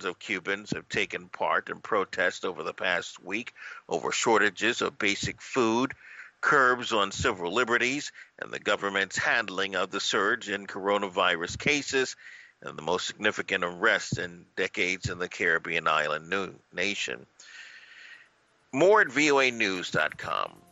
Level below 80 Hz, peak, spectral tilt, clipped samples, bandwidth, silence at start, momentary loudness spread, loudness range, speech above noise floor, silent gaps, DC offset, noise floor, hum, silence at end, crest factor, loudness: -60 dBFS; -10 dBFS; -3 dB/octave; under 0.1%; 8.4 kHz; 0 s; 14 LU; 4 LU; 36 dB; none; under 0.1%; -64 dBFS; none; 0.25 s; 20 dB; -27 LUFS